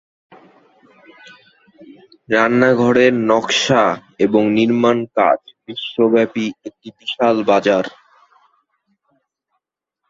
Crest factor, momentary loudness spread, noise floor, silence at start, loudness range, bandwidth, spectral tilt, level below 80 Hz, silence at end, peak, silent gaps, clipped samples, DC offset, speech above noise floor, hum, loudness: 16 dB; 14 LU; -77 dBFS; 1.8 s; 6 LU; 7.8 kHz; -5 dB/octave; -60 dBFS; 2.2 s; -2 dBFS; none; under 0.1%; under 0.1%; 62 dB; none; -16 LUFS